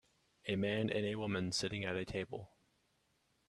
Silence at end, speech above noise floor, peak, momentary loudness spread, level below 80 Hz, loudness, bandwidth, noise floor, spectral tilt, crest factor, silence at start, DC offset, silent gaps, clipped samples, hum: 1.05 s; 40 dB; -20 dBFS; 10 LU; -68 dBFS; -39 LUFS; 13 kHz; -78 dBFS; -5 dB/octave; 20 dB; 0.45 s; under 0.1%; none; under 0.1%; none